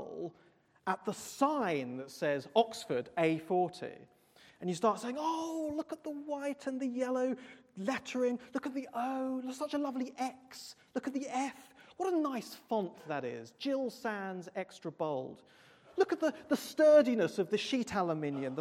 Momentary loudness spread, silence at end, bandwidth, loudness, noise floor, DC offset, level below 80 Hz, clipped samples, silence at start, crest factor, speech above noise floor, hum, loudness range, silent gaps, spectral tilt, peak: 11 LU; 0 s; 16 kHz; -35 LUFS; -67 dBFS; under 0.1%; -76 dBFS; under 0.1%; 0 s; 22 dB; 32 dB; none; 7 LU; none; -5 dB/octave; -14 dBFS